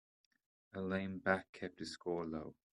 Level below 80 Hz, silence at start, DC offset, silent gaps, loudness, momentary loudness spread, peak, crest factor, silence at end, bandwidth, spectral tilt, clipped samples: -74 dBFS; 0.75 s; under 0.1%; 1.49-1.53 s; -41 LUFS; 11 LU; -16 dBFS; 26 dB; 0.25 s; 11 kHz; -6 dB/octave; under 0.1%